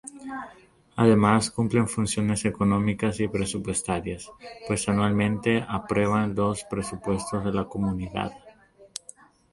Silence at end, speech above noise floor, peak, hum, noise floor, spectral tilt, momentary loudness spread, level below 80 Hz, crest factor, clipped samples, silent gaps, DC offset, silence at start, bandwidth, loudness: 0.65 s; 28 dB; -6 dBFS; none; -53 dBFS; -5.5 dB/octave; 16 LU; -48 dBFS; 20 dB; under 0.1%; none; under 0.1%; 0.05 s; 11.5 kHz; -25 LUFS